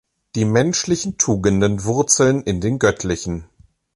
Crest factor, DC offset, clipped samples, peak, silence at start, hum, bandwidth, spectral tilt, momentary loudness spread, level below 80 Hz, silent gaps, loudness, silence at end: 16 dB; under 0.1%; under 0.1%; -2 dBFS; 0.35 s; none; 11.5 kHz; -4.5 dB/octave; 10 LU; -40 dBFS; none; -18 LUFS; 0.5 s